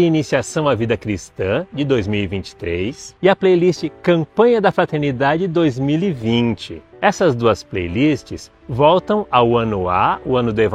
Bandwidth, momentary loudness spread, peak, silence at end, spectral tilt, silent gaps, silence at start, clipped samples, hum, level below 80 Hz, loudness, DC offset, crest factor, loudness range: 10 kHz; 10 LU; 0 dBFS; 0 s; -6.5 dB/octave; none; 0 s; under 0.1%; none; -44 dBFS; -17 LUFS; under 0.1%; 16 dB; 3 LU